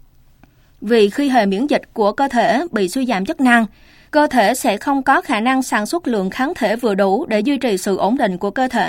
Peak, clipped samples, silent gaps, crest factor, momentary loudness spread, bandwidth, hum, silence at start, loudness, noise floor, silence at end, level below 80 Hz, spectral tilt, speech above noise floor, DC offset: 0 dBFS; under 0.1%; none; 16 dB; 6 LU; 16.5 kHz; none; 0.8 s; -17 LUFS; -50 dBFS; 0 s; -50 dBFS; -4.5 dB/octave; 33 dB; under 0.1%